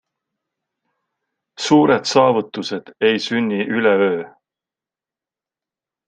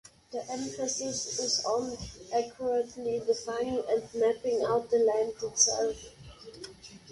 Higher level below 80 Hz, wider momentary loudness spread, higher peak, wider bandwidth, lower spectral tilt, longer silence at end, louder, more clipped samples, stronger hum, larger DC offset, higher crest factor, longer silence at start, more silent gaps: second, -66 dBFS vs -60 dBFS; second, 12 LU vs 20 LU; first, 0 dBFS vs -10 dBFS; second, 9.4 kHz vs 11.5 kHz; first, -5 dB/octave vs -2 dB/octave; first, 1.8 s vs 0 s; first, -17 LUFS vs -30 LUFS; neither; neither; neither; about the same, 20 dB vs 22 dB; first, 1.6 s vs 0.3 s; neither